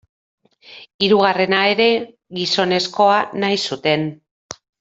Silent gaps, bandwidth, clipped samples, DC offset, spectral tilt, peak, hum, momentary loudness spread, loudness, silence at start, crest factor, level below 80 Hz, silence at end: 0.94-0.99 s, 4.31-4.49 s; 8.2 kHz; under 0.1%; under 0.1%; -4.5 dB/octave; 0 dBFS; none; 14 LU; -17 LUFS; 0.7 s; 18 dB; -62 dBFS; 0.3 s